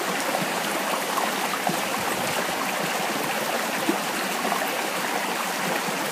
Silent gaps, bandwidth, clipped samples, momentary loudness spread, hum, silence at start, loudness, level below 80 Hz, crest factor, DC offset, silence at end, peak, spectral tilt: none; 15.5 kHz; under 0.1%; 1 LU; none; 0 s; -25 LUFS; -68 dBFS; 18 dB; under 0.1%; 0 s; -8 dBFS; -2.5 dB/octave